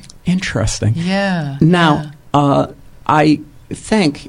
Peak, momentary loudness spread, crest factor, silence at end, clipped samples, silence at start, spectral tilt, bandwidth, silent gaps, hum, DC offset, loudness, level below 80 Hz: 0 dBFS; 8 LU; 14 dB; 0 s; under 0.1%; 0.15 s; -6 dB/octave; 11.5 kHz; none; none; under 0.1%; -15 LUFS; -36 dBFS